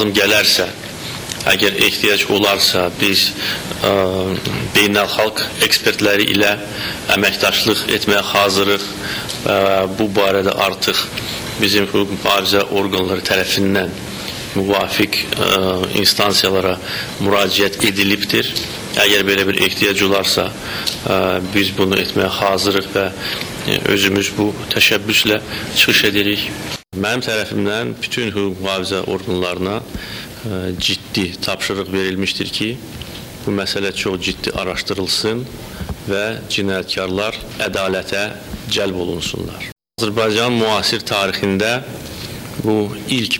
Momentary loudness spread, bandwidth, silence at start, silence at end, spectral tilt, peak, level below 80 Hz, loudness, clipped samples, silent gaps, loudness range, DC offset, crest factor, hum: 10 LU; over 20 kHz; 0 s; 0 s; -3.5 dB/octave; 0 dBFS; -44 dBFS; -16 LUFS; under 0.1%; 39.72-39.76 s; 6 LU; under 0.1%; 16 dB; none